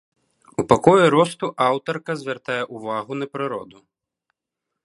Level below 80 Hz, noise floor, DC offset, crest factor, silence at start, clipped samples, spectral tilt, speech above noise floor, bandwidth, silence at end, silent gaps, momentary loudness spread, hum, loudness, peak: -54 dBFS; -83 dBFS; under 0.1%; 22 dB; 0.6 s; under 0.1%; -6 dB/octave; 63 dB; 11.5 kHz; 1.2 s; none; 14 LU; none; -20 LUFS; 0 dBFS